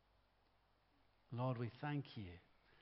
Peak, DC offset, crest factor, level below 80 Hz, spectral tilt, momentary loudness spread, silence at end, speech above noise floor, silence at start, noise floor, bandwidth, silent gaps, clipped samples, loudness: -30 dBFS; under 0.1%; 20 dB; -78 dBFS; -6.5 dB/octave; 12 LU; 0.4 s; 32 dB; 1.3 s; -77 dBFS; 5.6 kHz; none; under 0.1%; -47 LUFS